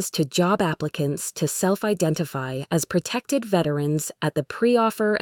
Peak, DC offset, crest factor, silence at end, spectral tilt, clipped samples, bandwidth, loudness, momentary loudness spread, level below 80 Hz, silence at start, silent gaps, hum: -8 dBFS; under 0.1%; 16 dB; 0 s; -5 dB/octave; under 0.1%; 19.5 kHz; -23 LUFS; 6 LU; -60 dBFS; 0 s; none; none